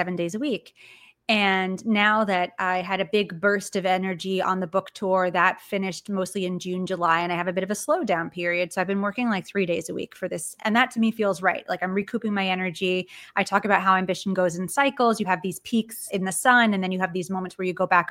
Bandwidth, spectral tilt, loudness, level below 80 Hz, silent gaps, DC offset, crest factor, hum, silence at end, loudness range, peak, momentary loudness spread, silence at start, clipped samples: 16.5 kHz; -4.5 dB/octave; -24 LUFS; -68 dBFS; none; under 0.1%; 22 dB; none; 0 s; 2 LU; -2 dBFS; 9 LU; 0 s; under 0.1%